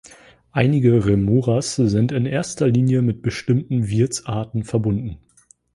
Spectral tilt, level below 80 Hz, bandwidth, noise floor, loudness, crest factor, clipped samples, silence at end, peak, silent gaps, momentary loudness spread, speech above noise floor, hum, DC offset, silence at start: -7 dB/octave; -44 dBFS; 11.5 kHz; -47 dBFS; -20 LUFS; 18 dB; under 0.1%; 0.6 s; -2 dBFS; none; 9 LU; 29 dB; none; under 0.1%; 0.55 s